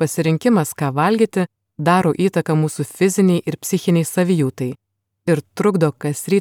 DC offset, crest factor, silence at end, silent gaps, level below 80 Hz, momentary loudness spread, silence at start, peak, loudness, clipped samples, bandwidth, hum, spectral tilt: under 0.1%; 16 dB; 0 s; none; -64 dBFS; 8 LU; 0 s; -2 dBFS; -18 LUFS; under 0.1%; 17.5 kHz; none; -6 dB/octave